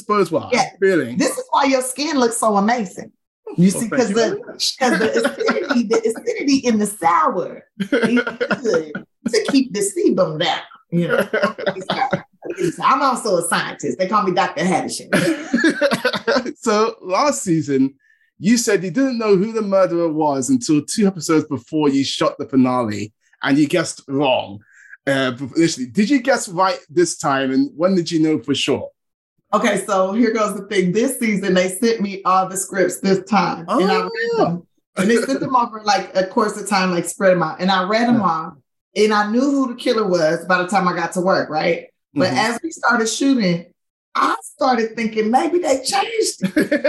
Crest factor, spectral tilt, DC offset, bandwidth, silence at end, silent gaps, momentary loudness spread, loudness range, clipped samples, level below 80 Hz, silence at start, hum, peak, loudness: 14 dB; -4.5 dB/octave; under 0.1%; 13 kHz; 0 s; 3.27-3.43 s, 29.14-29.36 s, 34.87-34.93 s, 38.81-38.92 s, 43.90-44.12 s; 5 LU; 2 LU; under 0.1%; -62 dBFS; 0.1 s; none; -4 dBFS; -18 LUFS